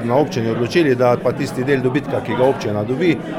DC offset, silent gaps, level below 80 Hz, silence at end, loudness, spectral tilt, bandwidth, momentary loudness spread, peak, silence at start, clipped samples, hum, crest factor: under 0.1%; none; -50 dBFS; 0 s; -18 LUFS; -7 dB/octave; 16 kHz; 6 LU; -2 dBFS; 0 s; under 0.1%; none; 14 dB